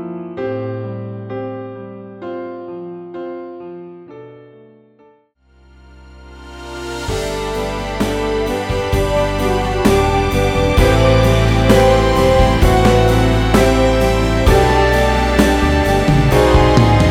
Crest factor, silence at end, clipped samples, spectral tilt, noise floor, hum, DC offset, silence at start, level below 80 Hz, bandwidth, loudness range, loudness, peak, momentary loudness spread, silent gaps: 14 dB; 0 s; under 0.1%; -6 dB/octave; -52 dBFS; none; under 0.1%; 0 s; -22 dBFS; 16.5 kHz; 19 LU; -14 LUFS; 0 dBFS; 18 LU; none